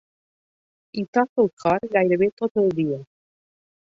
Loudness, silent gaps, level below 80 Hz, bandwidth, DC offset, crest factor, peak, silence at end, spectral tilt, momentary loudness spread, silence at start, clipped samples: -22 LUFS; 1.08-1.13 s, 1.29-1.36 s, 1.53-1.57 s, 2.32-2.37 s, 2.51-2.55 s; -62 dBFS; 7.6 kHz; under 0.1%; 18 dB; -6 dBFS; 0.85 s; -8 dB/octave; 10 LU; 0.95 s; under 0.1%